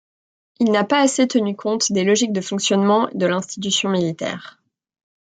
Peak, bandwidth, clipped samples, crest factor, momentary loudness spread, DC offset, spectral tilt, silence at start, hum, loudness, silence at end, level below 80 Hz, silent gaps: -4 dBFS; 9.4 kHz; under 0.1%; 16 dB; 7 LU; under 0.1%; -4 dB/octave; 0.6 s; none; -19 LUFS; 0.8 s; -68 dBFS; none